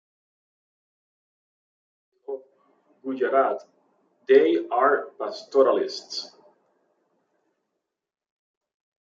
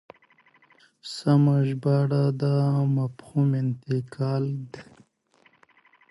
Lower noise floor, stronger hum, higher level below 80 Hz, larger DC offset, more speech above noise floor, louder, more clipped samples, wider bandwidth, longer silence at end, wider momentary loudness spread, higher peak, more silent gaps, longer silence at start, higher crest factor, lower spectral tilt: first, -82 dBFS vs -63 dBFS; neither; second, -86 dBFS vs -68 dBFS; neither; first, 59 dB vs 39 dB; about the same, -23 LUFS vs -24 LUFS; neither; second, 7.4 kHz vs 11.5 kHz; first, 2.75 s vs 1.3 s; first, 19 LU vs 15 LU; first, -6 dBFS vs -10 dBFS; neither; first, 2.3 s vs 1.05 s; first, 22 dB vs 16 dB; second, -3.5 dB/octave vs -8.5 dB/octave